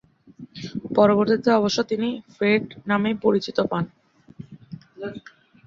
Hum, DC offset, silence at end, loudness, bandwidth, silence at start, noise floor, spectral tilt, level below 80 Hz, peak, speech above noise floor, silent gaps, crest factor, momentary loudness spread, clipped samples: none; under 0.1%; 0.5 s; -22 LUFS; 7.4 kHz; 0.4 s; -46 dBFS; -6 dB/octave; -62 dBFS; -4 dBFS; 24 dB; none; 20 dB; 24 LU; under 0.1%